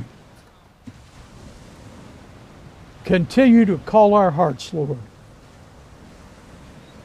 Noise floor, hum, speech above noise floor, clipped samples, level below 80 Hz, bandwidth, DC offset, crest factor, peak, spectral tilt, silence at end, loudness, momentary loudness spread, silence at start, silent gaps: -50 dBFS; none; 34 dB; under 0.1%; -50 dBFS; 10.5 kHz; under 0.1%; 18 dB; -4 dBFS; -7.5 dB/octave; 2 s; -17 LUFS; 17 LU; 0 s; none